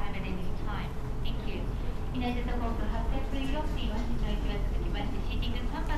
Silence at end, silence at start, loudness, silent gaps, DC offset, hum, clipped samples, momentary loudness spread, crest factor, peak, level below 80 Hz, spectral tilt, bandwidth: 0 s; 0 s; -35 LUFS; none; under 0.1%; none; under 0.1%; 3 LU; 12 dB; -18 dBFS; -32 dBFS; -6.5 dB/octave; 13 kHz